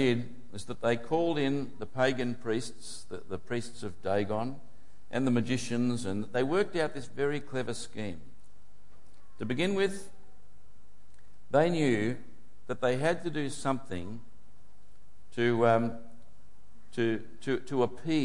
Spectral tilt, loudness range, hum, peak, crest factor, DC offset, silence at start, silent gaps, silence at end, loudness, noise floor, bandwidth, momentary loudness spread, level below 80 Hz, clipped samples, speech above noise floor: -6 dB/octave; 4 LU; none; -12 dBFS; 20 dB; 2%; 0 s; none; 0 s; -31 LUFS; -63 dBFS; 11.5 kHz; 15 LU; -64 dBFS; under 0.1%; 32 dB